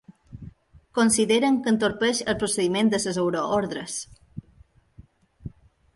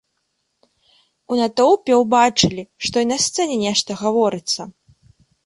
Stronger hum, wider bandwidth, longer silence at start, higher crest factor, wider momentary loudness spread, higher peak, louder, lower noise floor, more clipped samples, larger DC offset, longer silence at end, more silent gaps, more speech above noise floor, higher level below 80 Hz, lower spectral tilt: neither; about the same, 12 kHz vs 11.5 kHz; second, 0.1 s vs 1.3 s; about the same, 18 dB vs 18 dB; first, 23 LU vs 10 LU; second, -8 dBFS vs -2 dBFS; second, -23 LUFS vs -18 LUFS; second, -56 dBFS vs -72 dBFS; neither; neither; second, 0.45 s vs 0.75 s; neither; second, 33 dB vs 54 dB; about the same, -54 dBFS vs -56 dBFS; about the same, -4 dB/octave vs -3.5 dB/octave